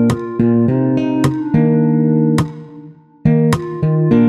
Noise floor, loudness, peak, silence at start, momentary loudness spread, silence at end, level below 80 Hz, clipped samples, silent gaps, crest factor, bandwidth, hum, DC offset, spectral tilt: -38 dBFS; -15 LUFS; 0 dBFS; 0 s; 5 LU; 0 s; -42 dBFS; under 0.1%; none; 14 dB; 13 kHz; none; under 0.1%; -8.5 dB/octave